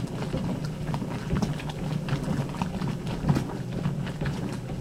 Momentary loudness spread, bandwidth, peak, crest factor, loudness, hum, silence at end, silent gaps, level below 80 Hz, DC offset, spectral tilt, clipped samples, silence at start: 5 LU; 15 kHz; -10 dBFS; 18 dB; -30 LUFS; none; 0 s; none; -42 dBFS; under 0.1%; -7 dB/octave; under 0.1%; 0 s